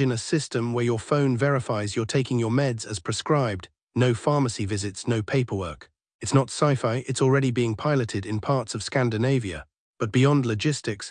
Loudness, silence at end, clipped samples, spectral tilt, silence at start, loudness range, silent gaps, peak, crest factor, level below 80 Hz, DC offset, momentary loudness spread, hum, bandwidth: -25 LUFS; 0 s; under 0.1%; -6 dB/octave; 0 s; 2 LU; 3.83-3.87 s, 6.14-6.19 s, 9.78-9.94 s; -6 dBFS; 18 dB; -58 dBFS; under 0.1%; 8 LU; none; 10.5 kHz